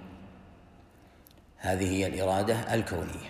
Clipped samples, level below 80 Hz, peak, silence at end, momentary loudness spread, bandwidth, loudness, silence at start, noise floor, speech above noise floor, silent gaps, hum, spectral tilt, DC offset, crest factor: under 0.1%; -54 dBFS; -16 dBFS; 0 s; 21 LU; 15.5 kHz; -30 LUFS; 0 s; -56 dBFS; 27 dB; none; none; -5.5 dB/octave; under 0.1%; 18 dB